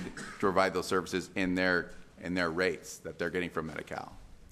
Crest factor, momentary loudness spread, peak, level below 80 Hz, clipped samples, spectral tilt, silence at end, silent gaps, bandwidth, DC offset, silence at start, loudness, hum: 22 dB; 14 LU; -12 dBFS; -56 dBFS; under 0.1%; -4.5 dB/octave; 0.05 s; none; 15 kHz; under 0.1%; 0 s; -32 LUFS; none